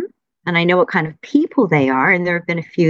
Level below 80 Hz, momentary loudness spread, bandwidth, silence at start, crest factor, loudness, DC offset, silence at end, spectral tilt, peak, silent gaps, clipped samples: -62 dBFS; 7 LU; 7.2 kHz; 0 s; 16 dB; -16 LUFS; under 0.1%; 0 s; -7.5 dB/octave; -2 dBFS; none; under 0.1%